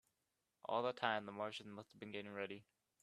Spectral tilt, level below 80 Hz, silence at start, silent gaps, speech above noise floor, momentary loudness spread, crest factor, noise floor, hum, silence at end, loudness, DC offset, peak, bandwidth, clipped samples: -5 dB/octave; -90 dBFS; 0.65 s; none; 43 dB; 15 LU; 26 dB; -88 dBFS; none; 0.4 s; -45 LUFS; under 0.1%; -20 dBFS; 13 kHz; under 0.1%